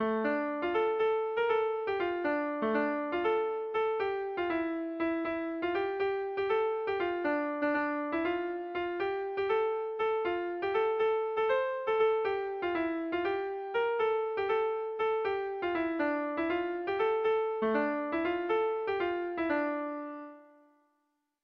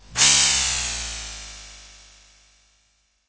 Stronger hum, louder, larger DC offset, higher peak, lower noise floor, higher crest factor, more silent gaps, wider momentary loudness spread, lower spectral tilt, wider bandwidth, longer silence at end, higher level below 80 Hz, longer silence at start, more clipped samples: neither; second, -32 LUFS vs -17 LUFS; neither; second, -18 dBFS vs -2 dBFS; first, -79 dBFS vs -65 dBFS; second, 14 dB vs 22 dB; neither; second, 4 LU vs 23 LU; first, -7 dB/octave vs 1 dB/octave; second, 5.6 kHz vs 8 kHz; second, 1 s vs 1.4 s; second, -68 dBFS vs -44 dBFS; about the same, 0 s vs 0.1 s; neither